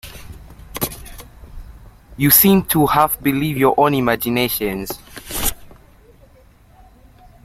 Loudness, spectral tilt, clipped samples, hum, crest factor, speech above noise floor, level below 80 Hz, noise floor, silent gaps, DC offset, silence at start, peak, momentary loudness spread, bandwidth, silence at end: -16 LUFS; -4.5 dB/octave; under 0.1%; none; 20 dB; 33 dB; -40 dBFS; -48 dBFS; none; under 0.1%; 0.05 s; 0 dBFS; 22 LU; 16.5 kHz; 1.7 s